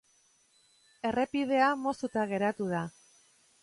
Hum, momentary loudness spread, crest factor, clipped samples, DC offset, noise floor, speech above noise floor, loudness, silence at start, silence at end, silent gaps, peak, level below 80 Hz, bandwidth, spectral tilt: none; 9 LU; 18 dB; under 0.1%; under 0.1%; -68 dBFS; 38 dB; -31 LUFS; 1.05 s; 0.75 s; none; -14 dBFS; -70 dBFS; 11.5 kHz; -6 dB/octave